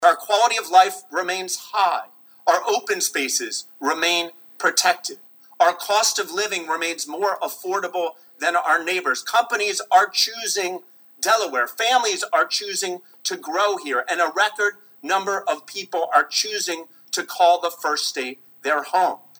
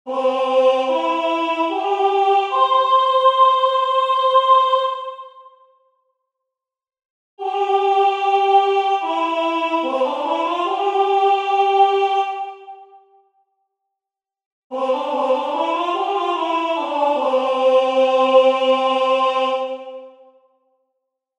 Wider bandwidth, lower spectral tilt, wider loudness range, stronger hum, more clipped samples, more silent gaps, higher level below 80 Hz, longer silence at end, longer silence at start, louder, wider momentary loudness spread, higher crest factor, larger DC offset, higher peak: first, over 20 kHz vs 8.8 kHz; second, 0.5 dB/octave vs -2 dB/octave; second, 2 LU vs 8 LU; neither; neither; second, none vs 7.05-7.37 s, 14.46-14.70 s; second, -86 dBFS vs -80 dBFS; second, 0.25 s vs 1.3 s; about the same, 0 s vs 0.05 s; second, -21 LUFS vs -17 LUFS; about the same, 10 LU vs 9 LU; about the same, 20 dB vs 16 dB; neither; about the same, -2 dBFS vs -2 dBFS